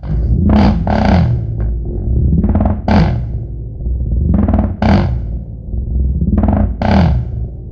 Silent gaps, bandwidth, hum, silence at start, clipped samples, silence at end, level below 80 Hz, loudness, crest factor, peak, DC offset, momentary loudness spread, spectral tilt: none; 6.4 kHz; none; 0 s; under 0.1%; 0 s; -18 dBFS; -15 LUFS; 12 dB; -2 dBFS; under 0.1%; 12 LU; -9.5 dB/octave